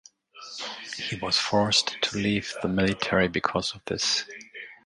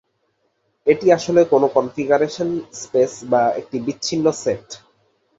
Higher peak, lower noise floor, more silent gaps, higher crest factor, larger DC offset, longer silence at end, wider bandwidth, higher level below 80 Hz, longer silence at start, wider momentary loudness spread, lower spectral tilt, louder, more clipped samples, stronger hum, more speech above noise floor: second, -6 dBFS vs -2 dBFS; second, -46 dBFS vs -68 dBFS; neither; about the same, 22 dB vs 18 dB; neither; second, 0.1 s vs 0.65 s; first, 11.5 kHz vs 8 kHz; first, -54 dBFS vs -60 dBFS; second, 0.35 s vs 0.85 s; first, 16 LU vs 11 LU; second, -3.5 dB/octave vs -5 dB/octave; second, -26 LUFS vs -19 LUFS; neither; neither; second, 20 dB vs 50 dB